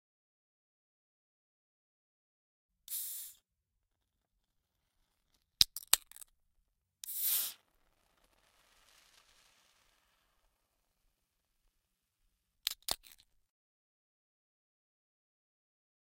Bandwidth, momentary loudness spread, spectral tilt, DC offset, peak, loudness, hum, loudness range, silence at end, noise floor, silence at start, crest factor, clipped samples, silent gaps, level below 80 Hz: 16 kHz; 19 LU; 1.5 dB/octave; under 0.1%; -2 dBFS; -34 LUFS; none; 13 LU; 3.15 s; -86 dBFS; 2.9 s; 42 dB; under 0.1%; none; -70 dBFS